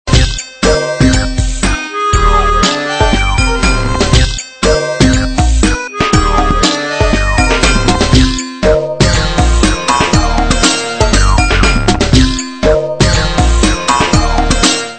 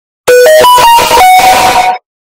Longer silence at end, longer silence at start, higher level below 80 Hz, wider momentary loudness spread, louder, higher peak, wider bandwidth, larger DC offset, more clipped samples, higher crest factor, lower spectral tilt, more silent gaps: second, 0 s vs 0.3 s; second, 0.05 s vs 0.25 s; first, -14 dBFS vs -34 dBFS; about the same, 4 LU vs 5 LU; second, -11 LUFS vs -3 LUFS; about the same, 0 dBFS vs 0 dBFS; second, 11 kHz vs over 20 kHz; neither; second, 0.4% vs 6%; first, 10 dB vs 4 dB; first, -4 dB/octave vs -1 dB/octave; neither